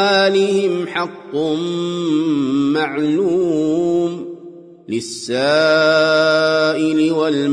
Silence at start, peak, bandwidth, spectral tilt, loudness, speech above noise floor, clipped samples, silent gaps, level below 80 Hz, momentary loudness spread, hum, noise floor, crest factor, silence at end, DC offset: 0 s; -4 dBFS; 10.5 kHz; -5 dB/octave; -16 LUFS; 22 dB; under 0.1%; none; -64 dBFS; 10 LU; none; -38 dBFS; 12 dB; 0 s; under 0.1%